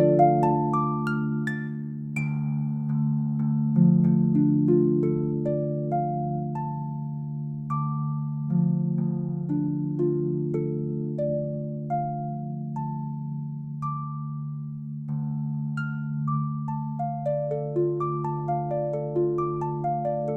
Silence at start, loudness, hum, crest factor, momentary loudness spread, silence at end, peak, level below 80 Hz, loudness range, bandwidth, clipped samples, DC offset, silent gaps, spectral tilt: 0 s; -27 LUFS; none; 18 dB; 11 LU; 0 s; -8 dBFS; -60 dBFS; 8 LU; 3.7 kHz; under 0.1%; under 0.1%; none; -11 dB/octave